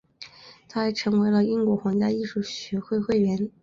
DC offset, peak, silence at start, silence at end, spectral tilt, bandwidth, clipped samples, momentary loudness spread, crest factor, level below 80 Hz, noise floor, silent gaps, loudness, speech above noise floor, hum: under 0.1%; -12 dBFS; 0.2 s; 0.15 s; -6.5 dB/octave; 7.4 kHz; under 0.1%; 12 LU; 14 dB; -60 dBFS; -48 dBFS; none; -25 LUFS; 25 dB; none